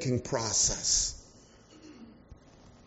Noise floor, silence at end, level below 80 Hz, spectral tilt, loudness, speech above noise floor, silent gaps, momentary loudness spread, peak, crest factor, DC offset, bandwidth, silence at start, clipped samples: -56 dBFS; 0.15 s; -50 dBFS; -4 dB/octave; -27 LUFS; 27 dB; none; 8 LU; -14 dBFS; 18 dB; under 0.1%; 8 kHz; 0 s; under 0.1%